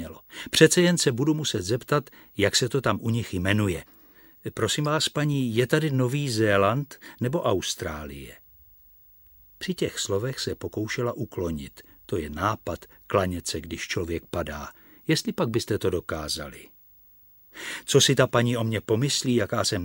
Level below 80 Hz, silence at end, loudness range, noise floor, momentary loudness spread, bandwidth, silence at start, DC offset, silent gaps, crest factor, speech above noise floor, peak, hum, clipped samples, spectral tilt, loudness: -50 dBFS; 0 s; 7 LU; -55 dBFS; 15 LU; 17 kHz; 0 s; under 0.1%; none; 24 dB; 29 dB; -2 dBFS; none; under 0.1%; -4.5 dB/octave; -25 LUFS